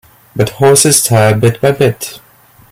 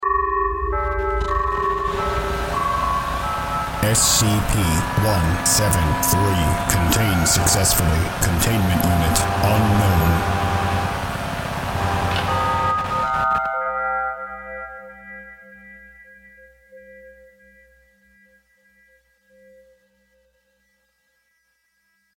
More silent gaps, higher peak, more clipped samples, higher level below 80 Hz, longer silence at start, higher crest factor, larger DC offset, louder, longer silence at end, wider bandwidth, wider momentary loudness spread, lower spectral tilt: neither; about the same, 0 dBFS vs 0 dBFS; neither; second, -44 dBFS vs -32 dBFS; first, 0.35 s vs 0 s; second, 12 dB vs 22 dB; neither; first, -9 LUFS vs -19 LUFS; second, 0.55 s vs 5.05 s; first, over 20 kHz vs 17 kHz; first, 16 LU vs 9 LU; about the same, -4 dB/octave vs -4 dB/octave